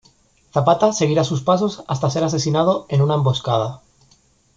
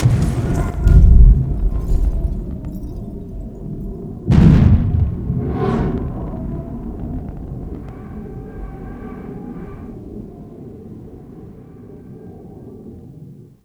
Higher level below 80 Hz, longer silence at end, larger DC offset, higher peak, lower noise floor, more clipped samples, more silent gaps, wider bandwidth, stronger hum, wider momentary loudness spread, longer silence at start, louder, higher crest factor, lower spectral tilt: second, -54 dBFS vs -20 dBFS; first, 0.8 s vs 0.25 s; neither; about the same, -2 dBFS vs 0 dBFS; first, -57 dBFS vs -39 dBFS; neither; neither; second, 7.8 kHz vs 9 kHz; neither; second, 6 LU vs 25 LU; first, 0.55 s vs 0 s; about the same, -19 LUFS vs -18 LUFS; about the same, 16 dB vs 18 dB; second, -6 dB/octave vs -9 dB/octave